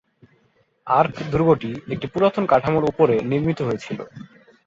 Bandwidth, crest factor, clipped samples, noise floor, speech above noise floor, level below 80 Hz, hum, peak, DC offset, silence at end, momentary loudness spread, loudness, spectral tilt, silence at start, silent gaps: 7.6 kHz; 18 dB; under 0.1%; -62 dBFS; 42 dB; -50 dBFS; none; -2 dBFS; under 0.1%; 0.4 s; 12 LU; -20 LUFS; -8 dB/octave; 0.85 s; none